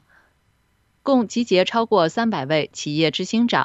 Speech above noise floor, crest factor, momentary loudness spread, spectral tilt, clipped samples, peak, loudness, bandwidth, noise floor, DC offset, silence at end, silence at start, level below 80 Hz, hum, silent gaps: 45 dB; 18 dB; 4 LU; -5 dB/octave; under 0.1%; -4 dBFS; -20 LUFS; 8.2 kHz; -64 dBFS; under 0.1%; 0 s; 1.05 s; -64 dBFS; none; none